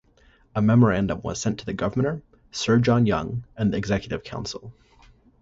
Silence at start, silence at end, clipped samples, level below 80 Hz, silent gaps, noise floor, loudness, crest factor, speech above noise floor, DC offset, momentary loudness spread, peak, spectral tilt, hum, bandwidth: 0.55 s; 0.7 s; under 0.1%; -46 dBFS; none; -58 dBFS; -24 LUFS; 18 dB; 35 dB; under 0.1%; 14 LU; -6 dBFS; -6.5 dB/octave; none; 8 kHz